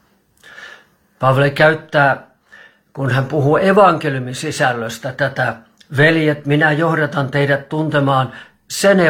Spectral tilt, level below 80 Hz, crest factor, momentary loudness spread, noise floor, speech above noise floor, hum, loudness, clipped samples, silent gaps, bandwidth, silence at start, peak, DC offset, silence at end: -6 dB/octave; -54 dBFS; 16 dB; 12 LU; -49 dBFS; 34 dB; none; -16 LUFS; under 0.1%; none; 16 kHz; 0.55 s; 0 dBFS; under 0.1%; 0 s